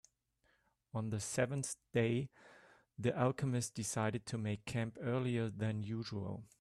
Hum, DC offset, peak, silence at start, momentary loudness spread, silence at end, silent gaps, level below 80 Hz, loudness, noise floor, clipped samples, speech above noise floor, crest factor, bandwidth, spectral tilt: none; under 0.1%; -20 dBFS; 0.95 s; 8 LU; 0.15 s; none; -70 dBFS; -39 LUFS; -78 dBFS; under 0.1%; 40 dB; 20 dB; 13 kHz; -5.5 dB/octave